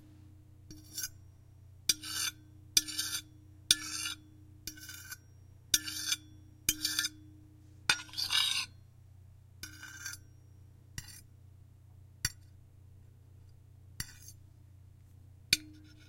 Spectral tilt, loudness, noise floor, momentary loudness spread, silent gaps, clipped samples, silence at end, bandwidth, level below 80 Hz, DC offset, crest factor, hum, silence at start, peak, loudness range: 0 dB/octave; -33 LUFS; -57 dBFS; 20 LU; none; under 0.1%; 0 s; 16.5 kHz; -62 dBFS; under 0.1%; 36 dB; none; 0 s; -4 dBFS; 13 LU